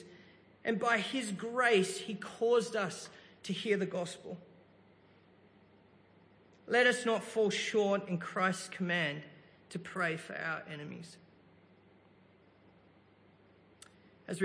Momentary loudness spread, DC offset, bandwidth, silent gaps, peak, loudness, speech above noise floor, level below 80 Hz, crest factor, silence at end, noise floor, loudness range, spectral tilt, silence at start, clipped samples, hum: 18 LU; under 0.1%; 10.5 kHz; none; -14 dBFS; -33 LUFS; 30 dB; -82 dBFS; 22 dB; 0 s; -64 dBFS; 10 LU; -4 dB/octave; 0 s; under 0.1%; none